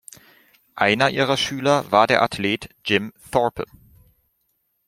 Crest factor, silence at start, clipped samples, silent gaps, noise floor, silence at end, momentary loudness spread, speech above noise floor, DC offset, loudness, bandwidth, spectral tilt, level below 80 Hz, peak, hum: 20 dB; 0.75 s; under 0.1%; none; -70 dBFS; 1.25 s; 8 LU; 50 dB; under 0.1%; -20 LUFS; 16 kHz; -4.5 dB/octave; -56 dBFS; -2 dBFS; none